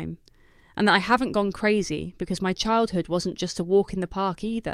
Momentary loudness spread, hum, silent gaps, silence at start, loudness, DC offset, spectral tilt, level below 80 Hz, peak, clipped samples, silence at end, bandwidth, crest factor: 10 LU; none; none; 0 s; -24 LUFS; under 0.1%; -5 dB/octave; -48 dBFS; -6 dBFS; under 0.1%; 0 s; 14 kHz; 20 dB